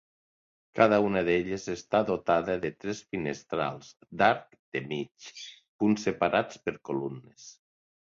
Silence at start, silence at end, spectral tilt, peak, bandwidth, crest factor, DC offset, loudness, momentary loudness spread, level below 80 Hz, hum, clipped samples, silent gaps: 0.75 s; 0.55 s; -5.5 dB/octave; -6 dBFS; 7.6 kHz; 24 dB; under 0.1%; -29 LUFS; 18 LU; -62 dBFS; none; under 0.1%; 4.59-4.72 s, 5.68-5.79 s